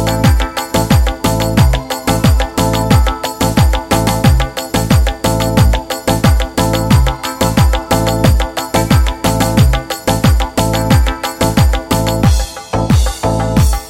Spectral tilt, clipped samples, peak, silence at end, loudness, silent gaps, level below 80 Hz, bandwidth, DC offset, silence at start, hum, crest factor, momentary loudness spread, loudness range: -5.5 dB/octave; under 0.1%; 0 dBFS; 0 s; -13 LUFS; none; -16 dBFS; 17 kHz; under 0.1%; 0 s; none; 12 dB; 5 LU; 1 LU